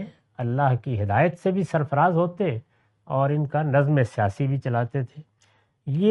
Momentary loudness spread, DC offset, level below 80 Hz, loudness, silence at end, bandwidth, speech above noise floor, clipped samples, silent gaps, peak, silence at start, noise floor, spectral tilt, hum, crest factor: 10 LU; under 0.1%; -62 dBFS; -24 LUFS; 0 s; 9.4 kHz; 41 dB; under 0.1%; none; -6 dBFS; 0 s; -64 dBFS; -9 dB/octave; none; 18 dB